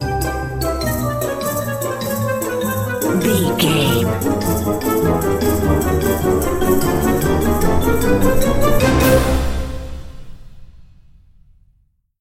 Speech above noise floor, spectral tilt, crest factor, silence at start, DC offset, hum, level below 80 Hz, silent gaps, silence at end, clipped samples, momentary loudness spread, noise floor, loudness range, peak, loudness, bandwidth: 42 dB; -5.5 dB/octave; 16 dB; 0 s; under 0.1%; none; -26 dBFS; none; 1.35 s; under 0.1%; 7 LU; -59 dBFS; 4 LU; -2 dBFS; -17 LUFS; 16.5 kHz